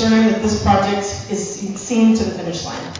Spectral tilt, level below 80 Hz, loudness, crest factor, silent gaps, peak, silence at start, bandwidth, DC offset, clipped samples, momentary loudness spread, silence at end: -5 dB/octave; -36 dBFS; -18 LUFS; 16 dB; none; -2 dBFS; 0 s; 7.6 kHz; under 0.1%; under 0.1%; 10 LU; 0 s